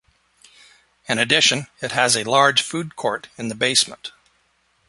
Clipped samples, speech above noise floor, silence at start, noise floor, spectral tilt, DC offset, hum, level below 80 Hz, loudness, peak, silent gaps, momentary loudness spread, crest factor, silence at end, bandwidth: under 0.1%; 44 dB; 1.1 s; -64 dBFS; -2 dB/octave; under 0.1%; none; -62 dBFS; -18 LUFS; -2 dBFS; none; 13 LU; 22 dB; 0.8 s; 12 kHz